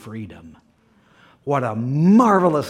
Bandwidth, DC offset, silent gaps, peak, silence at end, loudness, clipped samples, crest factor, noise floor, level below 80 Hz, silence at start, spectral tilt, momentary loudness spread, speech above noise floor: 13.5 kHz; under 0.1%; none; -4 dBFS; 0 s; -17 LUFS; under 0.1%; 16 dB; -57 dBFS; -60 dBFS; 0.05 s; -8 dB/octave; 21 LU; 39 dB